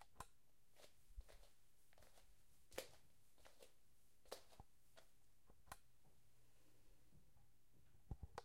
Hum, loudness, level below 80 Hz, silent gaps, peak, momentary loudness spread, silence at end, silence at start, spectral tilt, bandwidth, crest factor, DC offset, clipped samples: none; -61 LUFS; -70 dBFS; none; -32 dBFS; 10 LU; 0 s; 0 s; -3.5 dB/octave; 16 kHz; 32 dB; under 0.1%; under 0.1%